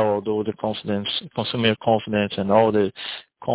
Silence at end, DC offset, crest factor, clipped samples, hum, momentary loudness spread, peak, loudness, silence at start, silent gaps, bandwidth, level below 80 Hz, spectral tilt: 0 s; under 0.1%; 18 dB; under 0.1%; none; 9 LU; -4 dBFS; -22 LUFS; 0 s; none; 4 kHz; -54 dBFS; -10 dB/octave